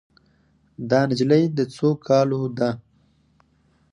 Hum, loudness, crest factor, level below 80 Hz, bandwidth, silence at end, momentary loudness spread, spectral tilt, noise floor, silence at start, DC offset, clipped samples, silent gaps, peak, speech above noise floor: none; -21 LUFS; 18 dB; -62 dBFS; 10.5 kHz; 1.1 s; 7 LU; -7.5 dB/octave; -62 dBFS; 0.8 s; under 0.1%; under 0.1%; none; -4 dBFS; 42 dB